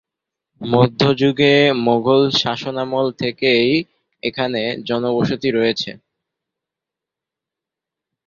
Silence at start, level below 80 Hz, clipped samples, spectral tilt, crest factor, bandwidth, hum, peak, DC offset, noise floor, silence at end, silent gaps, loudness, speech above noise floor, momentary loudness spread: 0.6 s; -56 dBFS; under 0.1%; -6 dB/octave; 16 dB; 7.4 kHz; none; -2 dBFS; under 0.1%; -85 dBFS; 2.3 s; none; -17 LUFS; 69 dB; 10 LU